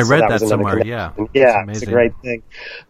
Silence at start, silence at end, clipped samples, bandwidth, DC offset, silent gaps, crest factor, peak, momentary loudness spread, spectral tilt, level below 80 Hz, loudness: 0 s; 0.1 s; under 0.1%; 15 kHz; under 0.1%; none; 16 dB; 0 dBFS; 13 LU; -6 dB/octave; -42 dBFS; -16 LUFS